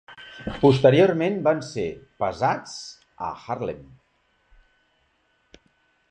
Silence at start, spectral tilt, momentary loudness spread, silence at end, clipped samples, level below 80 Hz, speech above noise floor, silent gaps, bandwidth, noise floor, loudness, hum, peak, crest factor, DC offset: 0.1 s; -6.5 dB/octave; 20 LU; 2.3 s; under 0.1%; -54 dBFS; 45 dB; none; 9.4 kHz; -67 dBFS; -22 LUFS; none; -4 dBFS; 20 dB; under 0.1%